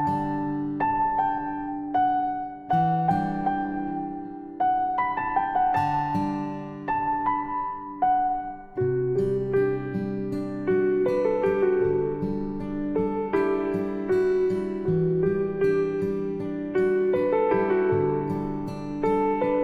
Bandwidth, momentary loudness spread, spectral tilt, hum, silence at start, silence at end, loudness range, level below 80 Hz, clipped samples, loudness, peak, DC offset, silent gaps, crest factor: 6 kHz; 8 LU; -9 dB/octave; none; 0 s; 0 s; 2 LU; -50 dBFS; under 0.1%; -25 LUFS; -10 dBFS; under 0.1%; none; 14 dB